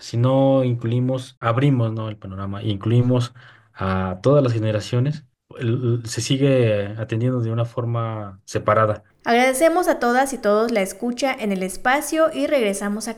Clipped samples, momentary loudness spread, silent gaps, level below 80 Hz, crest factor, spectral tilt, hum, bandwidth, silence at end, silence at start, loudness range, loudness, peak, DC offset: under 0.1%; 10 LU; 1.37-1.41 s; -54 dBFS; 18 dB; -6 dB/octave; none; 15.5 kHz; 0 s; 0 s; 3 LU; -20 LUFS; -4 dBFS; under 0.1%